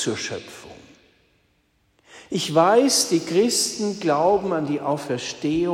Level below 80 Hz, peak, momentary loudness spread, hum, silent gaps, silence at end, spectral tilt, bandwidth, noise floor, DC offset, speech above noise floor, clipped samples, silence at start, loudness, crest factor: -60 dBFS; -4 dBFS; 13 LU; none; none; 0 s; -3.5 dB/octave; 16 kHz; -65 dBFS; under 0.1%; 44 dB; under 0.1%; 0 s; -21 LUFS; 18 dB